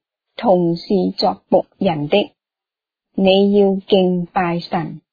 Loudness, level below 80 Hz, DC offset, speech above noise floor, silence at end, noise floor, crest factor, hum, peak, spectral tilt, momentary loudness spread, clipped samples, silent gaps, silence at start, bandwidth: -17 LUFS; -54 dBFS; under 0.1%; 72 dB; 0.15 s; -88 dBFS; 16 dB; none; -2 dBFS; -8.5 dB/octave; 10 LU; under 0.1%; none; 0.4 s; 5 kHz